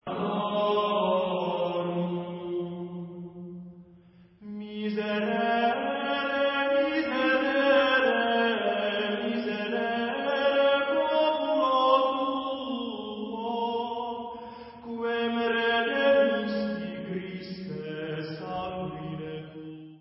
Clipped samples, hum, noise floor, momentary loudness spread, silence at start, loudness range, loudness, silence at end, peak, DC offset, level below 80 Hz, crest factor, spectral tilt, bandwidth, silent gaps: under 0.1%; none; -55 dBFS; 16 LU; 0.05 s; 9 LU; -27 LUFS; 0.05 s; -10 dBFS; under 0.1%; -66 dBFS; 18 dB; -9 dB/octave; 5.8 kHz; none